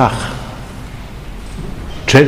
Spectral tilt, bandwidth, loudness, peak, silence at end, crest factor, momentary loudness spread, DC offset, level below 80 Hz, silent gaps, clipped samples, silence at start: -5.5 dB/octave; 16 kHz; -22 LUFS; 0 dBFS; 0 s; 16 dB; 16 LU; 0.4%; -30 dBFS; none; 0.6%; 0 s